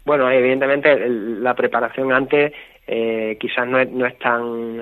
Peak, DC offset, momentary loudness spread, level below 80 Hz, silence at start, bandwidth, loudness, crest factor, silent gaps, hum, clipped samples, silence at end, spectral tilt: 0 dBFS; under 0.1%; 7 LU; -58 dBFS; 0.05 s; 13 kHz; -18 LUFS; 18 dB; none; none; under 0.1%; 0 s; -8 dB/octave